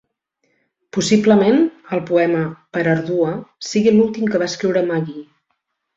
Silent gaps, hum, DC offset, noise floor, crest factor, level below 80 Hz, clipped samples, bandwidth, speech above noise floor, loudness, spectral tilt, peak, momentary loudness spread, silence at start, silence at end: none; none; under 0.1%; -72 dBFS; 16 dB; -58 dBFS; under 0.1%; 7.8 kHz; 55 dB; -17 LUFS; -6 dB/octave; -2 dBFS; 11 LU; 0.95 s; 0.75 s